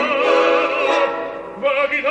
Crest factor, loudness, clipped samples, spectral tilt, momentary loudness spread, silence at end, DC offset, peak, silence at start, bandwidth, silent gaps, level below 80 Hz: 14 dB; -17 LUFS; under 0.1%; -3 dB/octave; 9 LU; 0 s; under 0.1%; -4 dBFS; 0 s; 9 kHz; none; -58 dBFS